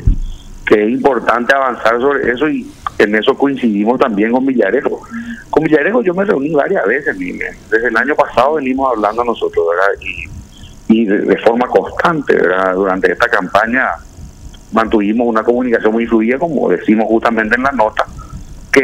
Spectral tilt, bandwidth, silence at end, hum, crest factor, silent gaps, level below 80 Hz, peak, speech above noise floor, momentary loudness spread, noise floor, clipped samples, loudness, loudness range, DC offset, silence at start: -6.5 dB/octave; 13.5 kHz; 0 s; none; 14 dB; none; -30 dBFS; 0 dBFS; 21 dB; 10 LU; -34 dBFS; under 0.1%; -13 LUFS; 2 LU; under 0.1%; 0 s